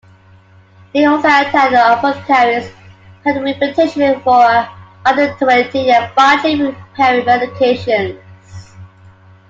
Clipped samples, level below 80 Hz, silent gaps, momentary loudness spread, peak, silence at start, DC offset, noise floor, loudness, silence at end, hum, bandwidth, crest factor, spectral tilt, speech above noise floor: under 0.1%; -54 dBFS; none; 8 LU; 0 dBFS; 0.95 s; under 0.1%; -44 dBFS; -13 LUFS; 0.65 s; none; 7.8 kHz; 14 dB; -5 dB/octave; 32 dB